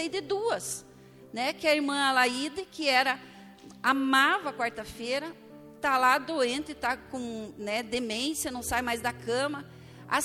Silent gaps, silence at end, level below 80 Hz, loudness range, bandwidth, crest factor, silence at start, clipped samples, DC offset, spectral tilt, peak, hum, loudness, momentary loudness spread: none; 0 s; -60 dBFS; 5 LU; 17 kHz; 20 dB; 0 s; under 0.1%; under 0.1%; -2.5 dB/octave; -10 dBFS; none; -28 LUFS; 14 LU